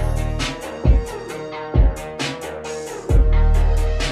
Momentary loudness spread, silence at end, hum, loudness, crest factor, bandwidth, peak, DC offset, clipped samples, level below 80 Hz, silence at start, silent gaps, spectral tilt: 11 LU; 0 s; none; -22 LUFS; 14 dB; 12 kHz; -4 dBFS; under 0.1%; under 0.1%; -18 dBFS; 0 s; none; -5.5 dB/octave